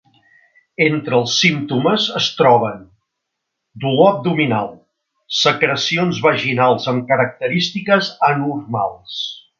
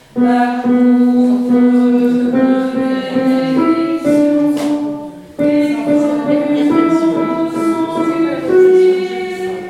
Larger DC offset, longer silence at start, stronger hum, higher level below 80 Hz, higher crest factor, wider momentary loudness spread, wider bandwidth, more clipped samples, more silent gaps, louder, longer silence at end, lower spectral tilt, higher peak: neither; first, 0.8 s vs 0.15 s; neither; second, -60 dBFS vs -54 dBFS; first, 18 dB vs 12 dB; first, 10 LU vs 7 LU; second, 7.4 kHz vs 12 kHz; neither; neither; second, -16 LUFS vs -13 LUFS; first, 0.2 s vs 0 s; second, -4.5 dB/octave vs -6.5 dB/octave; about the same, 0 dBFS vs 0 dBFS